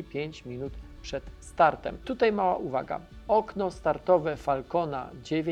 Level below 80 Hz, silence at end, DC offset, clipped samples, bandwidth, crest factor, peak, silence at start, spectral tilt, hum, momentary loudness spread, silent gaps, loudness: -50 dBFS; 0 s; under 0.1%; under 0.1%; 11.5 kHz; 20 dB; -8 dBFS; 0 s; -6.5 dB/octave; none; 14 LU; none; -29 LUFS